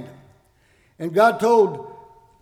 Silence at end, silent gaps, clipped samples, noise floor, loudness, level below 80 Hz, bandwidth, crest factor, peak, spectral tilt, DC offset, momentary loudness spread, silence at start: 0.5 s; none; under 0.1%; -59 dBFS; -18 LUFS; -64 dBFS; 15 kHz; 16 dB; -6 dBFS; -5.5 dB/octave; under 0.1%; 19 LU; 0 s